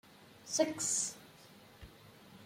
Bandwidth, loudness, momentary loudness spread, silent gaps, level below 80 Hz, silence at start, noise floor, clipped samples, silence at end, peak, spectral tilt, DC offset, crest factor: 16.5 kHz; -34 LUFS; 25 LU; none; -68 dBFS; 0.2 s; -59 dBFS; under 0.1%; 0 s; -16 dBFS; -2 dB/octave; under 0.1%; 24 dB